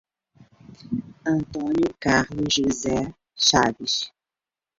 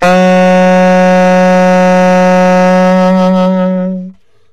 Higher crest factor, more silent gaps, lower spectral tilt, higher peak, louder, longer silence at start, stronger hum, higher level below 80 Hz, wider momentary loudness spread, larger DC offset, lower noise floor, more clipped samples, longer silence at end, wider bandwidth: first, 20 dB vs 6 dB; neither; second, -3.5 dB/octave vs -7 dB/octave; second, -4 dBFS vs 0 dBFS; second, -23 LUFS vs -7 LUFS; first, 0.4 s vs 0 s; neither; second, -50 dBFS vs -44 dBFS; first, 13 LU vs 5 LU; second, under 0.1% vs 4%; first, under -90 dBFS vs -30 dBFS; neither; first, 0.7 s vs 0 s; second, 7.8 kHz vs 9.8 kHz